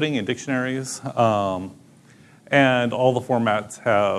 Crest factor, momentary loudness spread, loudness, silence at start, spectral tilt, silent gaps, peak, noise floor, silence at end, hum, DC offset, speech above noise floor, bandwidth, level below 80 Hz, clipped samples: 20 dB; 10 LU; -22 LUFS; 0 s; -5 dB/octave; none; -2 dBFS; -51 dBFS; 0 s; none; under 0.1%; 29 dB; 13 kHz; -66 dBFS; under 0.1%